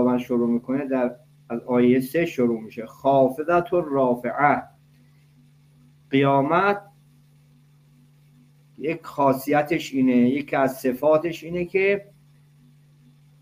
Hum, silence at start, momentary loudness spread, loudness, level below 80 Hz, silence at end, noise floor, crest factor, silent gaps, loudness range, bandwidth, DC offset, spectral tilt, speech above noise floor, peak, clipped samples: none; 0 s; 10 LU; -22 LUFS; -62 dBFS; 1.4 s; -55 dBFS; 20 dB; none; 4 LU; 15.5 kHz; under 0.1%; -7 dB/octave; 34 dB; -4 dBFS; under 0.1%